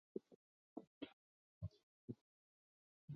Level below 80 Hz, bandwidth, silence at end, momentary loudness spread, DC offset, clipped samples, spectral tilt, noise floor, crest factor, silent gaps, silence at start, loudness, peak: -72 dBFS; 6.4 kHz; 0 s; 4 LU; under 0.1%; under 0.1%; -7.5 dB/octave; under -90 dBFS; 26 dB; 0.36-0.76 s, 0.87-1.01 s, 1.13-1.61 s, 1.83-2.08 s, 2.21-3.08 s; 0.15 s; -58 LUFS; -32 dBFS